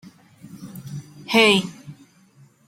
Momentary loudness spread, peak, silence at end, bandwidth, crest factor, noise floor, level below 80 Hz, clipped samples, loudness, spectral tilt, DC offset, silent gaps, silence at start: 24 LU; -2 dBFS; 0.75 s; 16.5 kHz; 22 dB; -54 dBFS; -66 dBFS; under 0.1%; -17 LUFS; -4 dB/octave; under 0.1%; none; 0.6 s